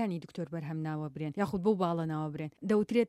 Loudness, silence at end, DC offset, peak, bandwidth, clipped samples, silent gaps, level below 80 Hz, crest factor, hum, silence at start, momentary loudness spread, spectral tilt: -34 LUFS; 0 s; under 0.1%; -16 dBFS; 13.5 kHz; under 0.1%; none; -66 dBFS; 16 dB; none; 0 s; 9 LU; -8 dB/octave